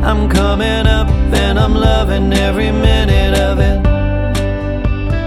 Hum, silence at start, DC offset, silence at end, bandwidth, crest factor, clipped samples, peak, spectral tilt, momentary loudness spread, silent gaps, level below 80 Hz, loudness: none; 0 s; under 0.1%; 0 s; 13 kHz; 12 dB; under 0.1%; 0 dBFS; -6 dB/octave; 5 LU; none; -14 dBFS; -13 LUFS